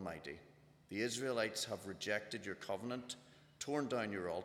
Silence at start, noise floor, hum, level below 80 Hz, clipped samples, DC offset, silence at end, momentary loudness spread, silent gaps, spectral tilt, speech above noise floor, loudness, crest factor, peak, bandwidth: 0 s; -65 dBFS; none; -78 dBFS; under 0.1%; under 0.1%; 0 s; 12 LU; none; -3.5 dB/octave; 24 dB; -42 LUFS; 18 dB; -24 dBFS; 17.5 kHz